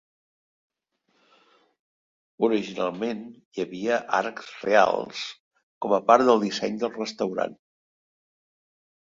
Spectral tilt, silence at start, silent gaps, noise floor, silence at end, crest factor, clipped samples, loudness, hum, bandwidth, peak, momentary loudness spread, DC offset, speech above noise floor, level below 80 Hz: -4.5 dB/octave; 2.4 s; 3.45-3.52 s, 5.40-5.51 s, 5.63-5.81 s; -72 dBFS; 1.5 s; 24 dB; under 0.1%; -25 LUFS; none; 7.6 kHz; -2 dBFS; 15 LU; under 0.1%; 48 dB; -72 dBFS